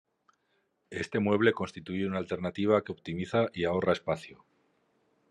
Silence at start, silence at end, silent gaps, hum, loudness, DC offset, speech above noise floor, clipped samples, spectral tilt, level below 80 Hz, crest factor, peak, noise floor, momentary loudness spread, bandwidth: 0.9 s; 0.95 s; none; none; -30 LUFS; under 0.1%; 46 dB; under 0.1%; -6.5 dB/octave; -68 dBFS; 20 dB; -10 dBFS; -75 dBFS; 11 LU; 10 kHz